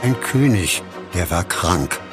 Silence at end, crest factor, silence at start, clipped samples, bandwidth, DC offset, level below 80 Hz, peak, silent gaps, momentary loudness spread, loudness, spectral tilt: 0 s; 18 dB; 0 s; under 0.1%; 15.5 kHz; under 0.1%; -36 dBFS; -2 dBFS; none; 7 LU; -19 LUFS; -4.5 dB/octave